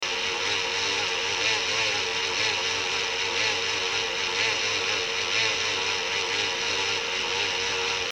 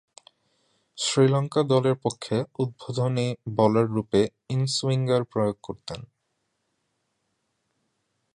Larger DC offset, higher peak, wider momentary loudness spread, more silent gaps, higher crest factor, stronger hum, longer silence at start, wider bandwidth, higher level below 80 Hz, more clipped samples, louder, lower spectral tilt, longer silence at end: neither; about the same, -10 dBFS vs -8 dBFS; second, 2 LU vs 9 LU; neither; about the same, 18 dB vs 20 dB; neither; second, 0 s vs 0.95 s; first, 18 kHz vs 11 kHz; about the same, -60 dBFS vs -60 dBFS; neither; about the same, -24 LUFS vs -25 LUFS; second, 0 dB/octave vs -6 dB/octave; second, 0 s vs 2.3 s